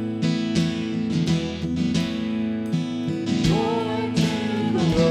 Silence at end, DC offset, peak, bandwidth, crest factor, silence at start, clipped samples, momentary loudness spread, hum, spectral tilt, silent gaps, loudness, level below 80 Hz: 0 s; under 0.1%; -8 dBFS; 11.5 kHz; 16 dB; 0 s; under 0.1%; 5 LU; none; -6.5 dB/octave; none; -23 LUFS; -46 dBFS